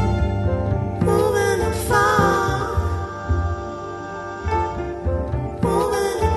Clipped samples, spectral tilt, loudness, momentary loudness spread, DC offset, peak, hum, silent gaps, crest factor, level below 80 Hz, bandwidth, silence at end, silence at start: under 0.1%; -6 dB/octave; -21 LUFS; 11 LU; under 0.1%; -2 dBFS; none; none; 18 dB; -30 dBFS; 12.5 kHz; 0 s; 0 s